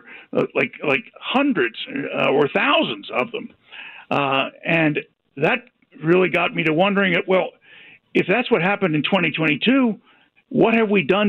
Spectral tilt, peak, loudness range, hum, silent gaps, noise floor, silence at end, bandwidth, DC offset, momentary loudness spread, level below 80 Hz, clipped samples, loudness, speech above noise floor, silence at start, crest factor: -7.5 dB/octave; -4 dBFS; 2 LU; none; none; -47 dBFS; 0 s; 7.2 kHz; under 0.1%; 11 LU; -64 dBFS; under 0.1%; -20 LUFS; 28 dB; 0.1 s; 16 dB